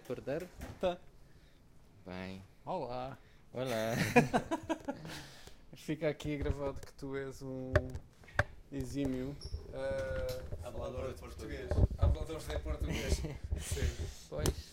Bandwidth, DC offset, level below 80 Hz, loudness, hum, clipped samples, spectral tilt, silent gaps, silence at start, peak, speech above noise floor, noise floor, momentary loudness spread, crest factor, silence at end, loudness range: 16 kHz; under 0.1%; -44 dBFS; -38 LUFS; none; under 0.1%; -5.5 dB/octave; none; 0 s; -12 dBFS; 23 dB; -60 dBFS; 13 LU; 26 dB; 0 s; 5 LU